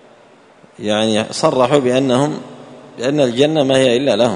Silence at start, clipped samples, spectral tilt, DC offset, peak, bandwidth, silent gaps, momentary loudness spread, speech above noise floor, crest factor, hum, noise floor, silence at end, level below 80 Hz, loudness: 0.8 s; under 0.1%; -5 dB/octave; under 0.1%; 0 dBFS; 11 kHz; none; 9 LU; 32 dB; 16 dB; none; -46 dBFS; 0 s; -56 dBFS; -15 LUFS